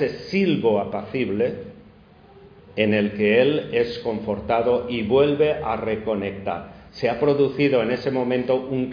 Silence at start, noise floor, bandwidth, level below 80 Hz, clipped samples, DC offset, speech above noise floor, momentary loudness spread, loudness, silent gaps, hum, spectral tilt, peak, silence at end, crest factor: 0 s; -49 dBFS; 5.2 kHz; -52 dBFS; under 0.1%; under 0.1%; 28 dB; 9 LU; -22 LUFS; none; none; -8 dB/octave; -4 dBFS; 0 s; 18 dB